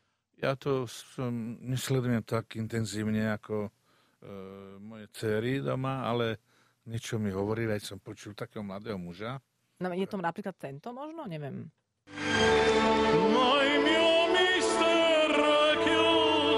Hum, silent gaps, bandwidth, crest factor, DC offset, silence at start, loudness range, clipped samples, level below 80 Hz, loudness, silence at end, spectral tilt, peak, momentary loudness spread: none; none; 15.5 kHz; 16 dB; under 0.1%; 0.4 s; 13 LU; under 0.1%; -58 dBFS; -28 LUFS; 0 s; -4.5 dB/octave; -14 dBFS; 18 LU